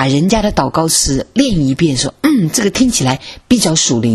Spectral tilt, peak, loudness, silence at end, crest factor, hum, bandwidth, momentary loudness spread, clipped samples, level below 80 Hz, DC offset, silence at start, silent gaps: -4 dB/octave; 0 dBFS; -13 LUFS; 0 s; 12 dB; none; 13.5 kHz; 3 LU; under 0.1%; -32 dBFS; under 0.1%; 0 s; none